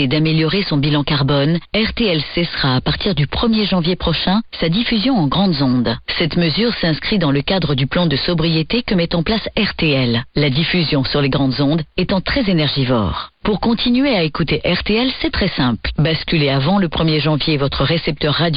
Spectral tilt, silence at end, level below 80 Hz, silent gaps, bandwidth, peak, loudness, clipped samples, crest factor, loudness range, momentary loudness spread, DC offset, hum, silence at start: -10 dB/octave; 0 s; -34 dBFS; none; 5.6 kHz; -4 dBFS; -16 LUFS; under 0.1%; 12 dB; 1 LU; 3 LU; under 0.1%; none; 0 s